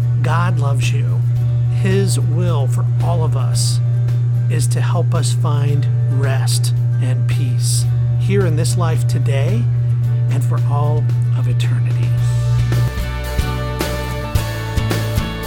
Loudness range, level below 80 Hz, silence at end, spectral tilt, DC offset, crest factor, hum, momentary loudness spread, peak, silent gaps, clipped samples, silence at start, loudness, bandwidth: 2 LU; -30 dBFS; 0 s; -6 dB/octave; under 0.1%; 12 dB; none; 5 LU; -2 dBFS; none; under 0.1%; 0 s; -17 LUFS; 15.5 kHz